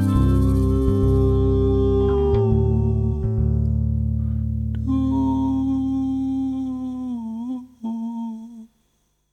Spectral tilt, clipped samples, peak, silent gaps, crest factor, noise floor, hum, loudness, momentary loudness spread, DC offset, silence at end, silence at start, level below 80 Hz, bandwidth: -10.5 dB/octave; under 0.1%; -6 dBFS; none; 14 dB; -67 dBFS; 50 Hz at -55 dBFS; -21 LUFS; 11 LU; under 0.1%; 0.7 s; 0 s; -26 dBFS; 11.5 kHz